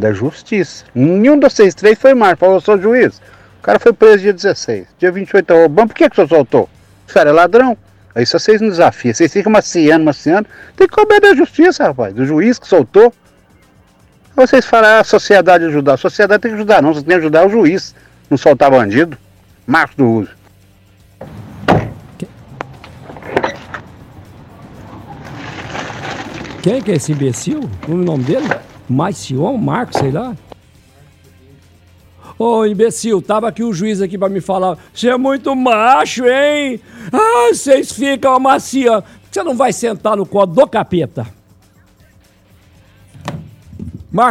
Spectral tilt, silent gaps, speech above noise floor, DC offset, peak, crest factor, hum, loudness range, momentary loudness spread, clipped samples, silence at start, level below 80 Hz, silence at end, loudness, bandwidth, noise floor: -5.5 dB/octave; none; 37 dB; under 0.1%; 0 dBFS; 12 dB; none; 11 LU; 19 LU; 0.4%; 0 s; -46 dBFS; 0 s; -11 LUFS; 14 kHz; -48 dBFS